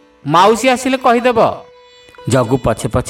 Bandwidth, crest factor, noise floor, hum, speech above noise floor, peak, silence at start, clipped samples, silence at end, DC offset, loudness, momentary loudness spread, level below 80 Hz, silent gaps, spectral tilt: 16.5 kHz; 14 dB; -42 dBFS; none; 30 dB; 0 dBFS; 0.25 s; under 0.1%; 0 s; under 0.1%; -13 LUFS; 6 LU; -38 dBFS; none; -5 dB/octave